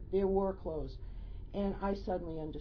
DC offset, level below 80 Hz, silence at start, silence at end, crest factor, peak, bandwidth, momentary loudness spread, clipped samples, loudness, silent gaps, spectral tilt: under 0.1%; -46 dBFS; 0 s; 0 s; 16 dB; -20 dBFS; 5.4 kHz; 16 LU; under 0.1%; -37 LUFS; none; -7.5 dB/octave